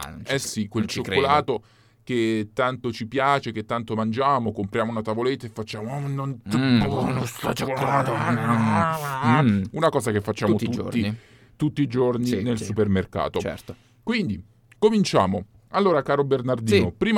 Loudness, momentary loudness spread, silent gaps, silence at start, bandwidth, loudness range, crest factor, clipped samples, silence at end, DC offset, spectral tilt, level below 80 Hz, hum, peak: -23 LUFS; 9 LU; none; 0 s; 18 kHz; 3 LU; 18 dB; under 0.1%; 0 s; under 0.1%; -6 dB/octave; -52 dBFS; none; -4 dBFS